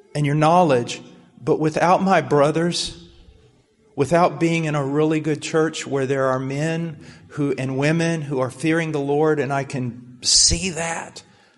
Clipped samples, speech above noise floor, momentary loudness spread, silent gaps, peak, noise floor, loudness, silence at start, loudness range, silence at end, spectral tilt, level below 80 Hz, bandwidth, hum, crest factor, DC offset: under 0.1%; 37 dB; 12 LU; none; -2 dBFS; -56 dBFS; -20 LUFS; 0.15 s; 3 LU; 0.35 s; -4 dB/octave; -44 dBFS; 11.5 kHz; none; 20 dB; under 0.1%